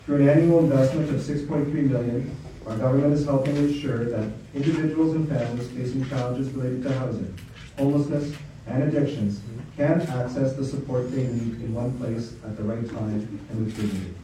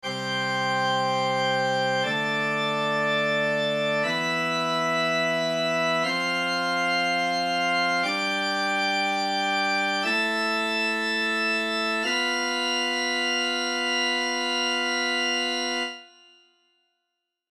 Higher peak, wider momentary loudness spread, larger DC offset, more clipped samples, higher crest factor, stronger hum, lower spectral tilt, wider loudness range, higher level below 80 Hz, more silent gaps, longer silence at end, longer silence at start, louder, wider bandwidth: first, -8 dBFS vs -12 dBFS; first, 11 LU vs 2 LU; neither; neither; about the same, 16 dB vs 14 dB; neither; first, -8.5 dB/octave vs -3 dB/octave; first, 5 LU vs 1 LU; first, -50 dBFS vs -80 dBFS; neither; second, 0 s vs 1.45 s; about the same, 0.05 s vs 0.05 s; about the same, -25 LUFS vs -24 LUFS; second, 11.5 kHz vs 14 kHz